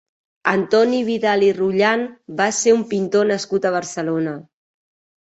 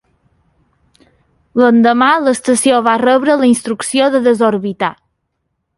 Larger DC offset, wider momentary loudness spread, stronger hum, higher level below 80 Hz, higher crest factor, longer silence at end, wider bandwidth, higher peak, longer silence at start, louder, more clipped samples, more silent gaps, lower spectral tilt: neither; about the same, 7 LU vs 8 LU; neither; second, -64 dBFS vs -58 dBFS; about the same, 18 dB vs 14 dB; about the same, 0.9 s vs 0.85 s; second, 8.2 kHz vs 11.5 kHz; about the same, -2 dBFS vs 0 dBFS; second, 0.45 s vs 1.55 s; second, -19 LUFS vs -12 LUFS; neither; neither; about the same, -4 dB/octave vs -4 dB/octave